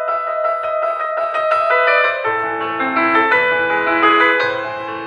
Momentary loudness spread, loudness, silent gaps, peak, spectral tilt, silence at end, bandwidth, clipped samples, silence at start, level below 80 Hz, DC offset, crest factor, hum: 7 LU; -15 LUFS; none; 0 dBFS; -5 dB/octave; 0 s; 10.5 kHz; under 0.1%; 0 s; -60 dBFS; under 0.1%; 16 dB; none